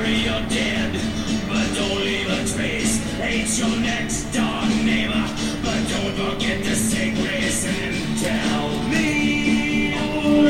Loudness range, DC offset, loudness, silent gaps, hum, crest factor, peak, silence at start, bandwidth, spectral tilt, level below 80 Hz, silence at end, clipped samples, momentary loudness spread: 1 LU; under 0.1%; -21 LUFS; none; none; 14 dB; -6 dBFS; 0 s; 16.5 kHz; -4 dB/octave; -36 dBFS; 0 s; under 0.1%; 4 LU